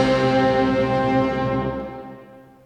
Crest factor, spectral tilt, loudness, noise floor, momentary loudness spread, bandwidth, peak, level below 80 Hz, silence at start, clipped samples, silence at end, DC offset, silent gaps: 14 dB; -7 dB/octave; -20 LUFS; -45 dBFS; 16 LU; 9.4 kHz; -6 dBFS; -42 dBFS; 0 s; under 0.1%; 0.25 s; under 0.1%; none